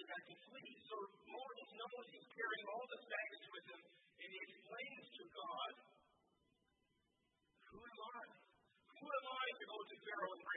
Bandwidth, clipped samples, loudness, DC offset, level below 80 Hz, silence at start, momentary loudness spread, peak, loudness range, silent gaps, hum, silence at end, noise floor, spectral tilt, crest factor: 3.9 kHz; under 0.1%; -51 LUFS; under 0.1%; under -90 dBFS; 0 s; 14 LU; -32 dBFS; 6 LU; none; none; 0 s; -85 dBFS; 3 dB/octave; 20 dB